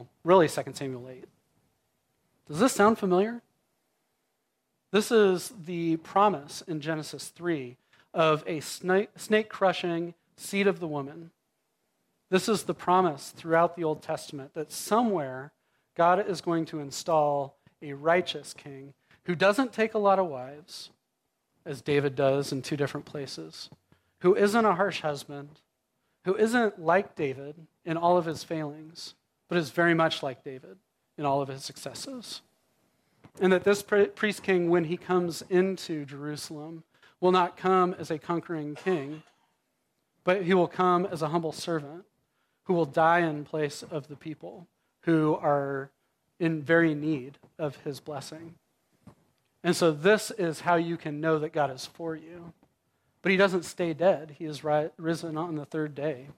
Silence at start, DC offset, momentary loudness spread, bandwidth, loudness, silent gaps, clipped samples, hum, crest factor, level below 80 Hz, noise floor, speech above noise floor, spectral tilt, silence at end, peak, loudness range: 0 s; under 0.1%; 18 LU; 16 kHz; -28 LUFS; none; under 0.1%; none; 22 dB; -74 dBFS; -79 dBFS; 52 dB; -5.5 dB/octave; 0.05 s; -8 dBFS; 3 LU